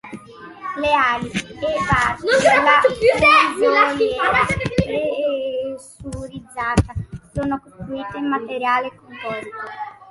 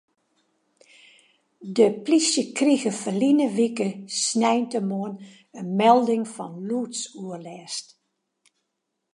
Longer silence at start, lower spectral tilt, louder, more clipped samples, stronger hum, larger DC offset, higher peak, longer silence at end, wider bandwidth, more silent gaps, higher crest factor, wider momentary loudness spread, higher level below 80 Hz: second, 0.05 s vs 1.6 s; about the same, -5 dB/octave vs -4 dB/octave; first, -18 LUFS vs -23 LUFS; neither; neither; neither; about the same, -2 dBFS vs -4 dBFS; second, 0 s vs 1.3 s; about the same, 11.5 kHz vs 11.5 kHz; neither; about the same, 18 dB vs 20 dB; about the same, 18 LU vs 16 LU; first, -40 dBFS vs -80 dBFS